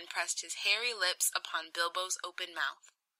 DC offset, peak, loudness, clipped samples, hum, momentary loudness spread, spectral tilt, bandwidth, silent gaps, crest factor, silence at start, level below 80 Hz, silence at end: under 0.1%; -14 dBFS; -33 LUFS; under 0.1%; none; 7 LU; 3.5 dB/octave; 16 kHz; none; 22 dB; 0 s; under -90 dBFS; 0.35 s